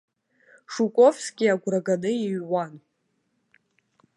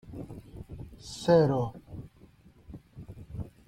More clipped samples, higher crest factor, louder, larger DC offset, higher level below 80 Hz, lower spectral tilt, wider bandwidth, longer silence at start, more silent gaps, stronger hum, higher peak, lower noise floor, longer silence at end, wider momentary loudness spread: neither; about the same, 20 dB vs 22 dB; first, -23 LUFS vs -26 LUFS; neither; second, -78 dBFS vs -52 dBFS; second, -5.5 dB/octave vs -7 dB/octave; about the same, 11.5 kHz vs 12.5 kHz; first, 0.7 s vs 0.05 s; neither; neither; first, -6 dBFS vs -10 dBFS; first, -73 dBFS vs -57 dBFS; first, 1.4 s vs 0.2 s; second, 10 LU vs 25 LU